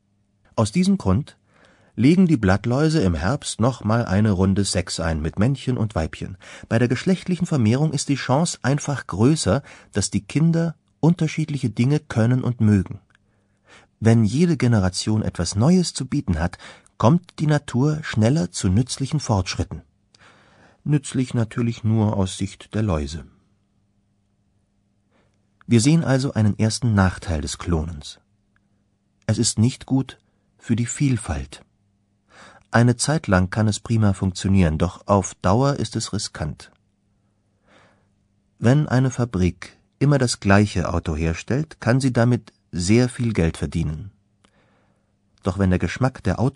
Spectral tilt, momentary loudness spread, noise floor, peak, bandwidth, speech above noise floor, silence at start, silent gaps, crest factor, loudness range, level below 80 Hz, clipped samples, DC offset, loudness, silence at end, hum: -6 dB/octave; 10 LU; -66 dBFS; 0 dBFS; 11 kHz; 46 dB; 0.55 s; none; 22 dB; 5 LU; -40 dBFS; under 0.1%; under 0.1%; -21 LUFS; 0.05 s; none